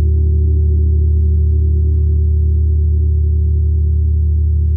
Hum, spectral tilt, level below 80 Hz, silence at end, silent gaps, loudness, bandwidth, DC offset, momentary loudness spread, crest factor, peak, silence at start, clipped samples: none; -14.5 dB/octave; -14 dBFS; 0 s; none; -14 LUFS; 0.5 kHz; under 0.1%; 1 LU; 6 dB; -6 dBFS; 0 s; under 0.1%